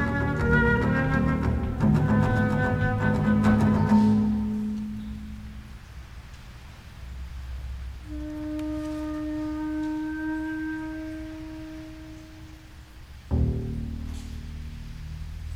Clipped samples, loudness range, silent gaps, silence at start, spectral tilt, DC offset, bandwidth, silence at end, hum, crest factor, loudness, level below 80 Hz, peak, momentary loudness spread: under 0.1%; 14 LU; none; 0 s; -8 dB/octave; under 0.1%; 11.5 kHz; 0 s; none; 18 dB; -26 LUFS; -36 dBFS; -8 dBFS; 23 LU